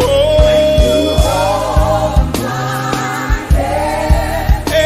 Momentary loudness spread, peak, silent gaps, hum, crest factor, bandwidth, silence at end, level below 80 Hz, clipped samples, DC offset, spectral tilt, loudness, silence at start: 7 LU; 0 dBFS; none; none; 12 dB; 15.5 kHz; 0 s; -18 dBFS; under 0.1%; under 0.1%; -5.5 dB/octave; -13 LUFS; 0 s